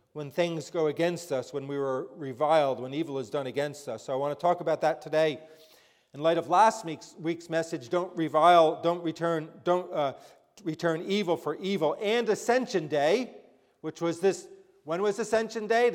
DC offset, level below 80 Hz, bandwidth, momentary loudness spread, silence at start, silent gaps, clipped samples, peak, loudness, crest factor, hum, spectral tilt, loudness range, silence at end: under 0.1%; -78 dBFS; 16 kHz; 11 LU; 0.15 s; none; under 0.1%; -8 dBFS; -28 LUFS; 20 dB; none; -5 dB/octave; 4 LU; 0 s